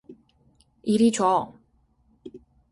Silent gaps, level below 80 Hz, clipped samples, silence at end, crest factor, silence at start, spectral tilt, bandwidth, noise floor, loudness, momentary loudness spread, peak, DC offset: none; -64 dBFS; under 0.1%; 0.35 s; 18 dB; 0.1 s; -5 dB/octave; 11.5 kHz; -64 dBFS; -23 LUFS; 26 LU; -8 dBFS; under 0.1%